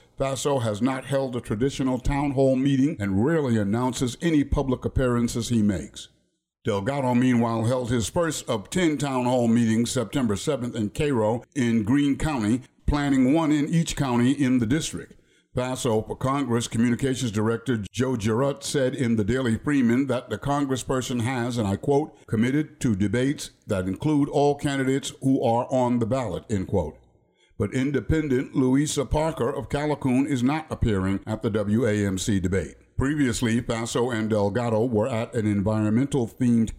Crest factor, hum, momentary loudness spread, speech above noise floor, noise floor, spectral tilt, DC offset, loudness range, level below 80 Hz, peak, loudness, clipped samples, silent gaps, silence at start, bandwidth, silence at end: 12 dB; none; 6 LU; 47 dB; -70 dBFS; -6 dB/octave; under 0.1%; 2 LU; -42 dBFS; -12 dBFS; -24 LUFS; under 0.1%; none; 0.2 s; 15.5 kHz; 0 s